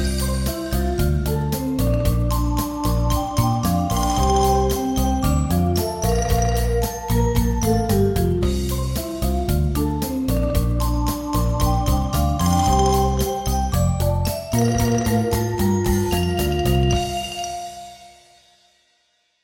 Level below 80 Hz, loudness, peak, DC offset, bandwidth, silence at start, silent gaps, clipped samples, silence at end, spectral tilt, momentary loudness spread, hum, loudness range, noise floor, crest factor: -26 dBFS; -21 LUFS; -4 dBFS; under 0.1%; 17 kHz; 0 s; none; under 0.1%; 1.35 s; -6 dB/octave; 5 LU; none; 2 LU; -65 dBFS; 16 dB